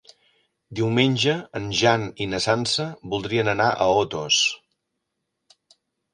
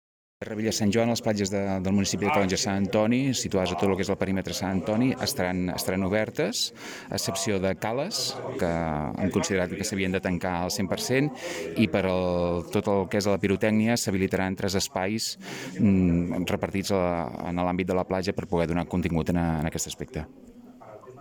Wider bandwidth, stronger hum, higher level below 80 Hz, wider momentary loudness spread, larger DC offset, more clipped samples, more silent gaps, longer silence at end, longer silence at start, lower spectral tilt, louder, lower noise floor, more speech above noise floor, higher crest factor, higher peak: second, 11 kHz vs 17.5 kHz; neither; second, -56 dBFS vs -50 dBFS; first, 9 LU vs 6 LU; neither; neither; neither; first, 1.55 s vs 0 s; first, 0.7 s vs 0.4 s; about the same, -4 dB/octave vs -5 dB/octave; first, -22 LUFS vs -26 LUFS; first, -79 dBFS vs -47 dBFS; first, 57 dB vs 20 dB; about the same, 20 dB vs 18 dB; first, -4 dBFS vs -10 dBFS